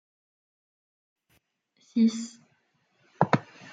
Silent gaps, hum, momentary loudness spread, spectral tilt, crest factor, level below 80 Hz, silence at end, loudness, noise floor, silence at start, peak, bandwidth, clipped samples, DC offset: none; none; 12 LU; -6.5 dB/octave; 28 dB; -76 dBFS; 0 s; -27 LUFS; -71 dBFS; 1.95 s; -4 dBFS; 9.2 kHz; under 0.1%; under 0.1%